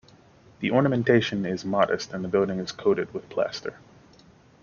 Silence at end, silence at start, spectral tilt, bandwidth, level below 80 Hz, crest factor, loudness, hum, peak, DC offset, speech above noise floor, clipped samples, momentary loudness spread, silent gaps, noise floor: 0.9 s; 0.6 s; -6 dB/octave; 7.2 kHz; -62 dBFS; 22 dB; -25 LUFS; none; -6 dBFS; under 0.1%; 30 dB; under 0.1%; 9 LU; none; -55 dBFS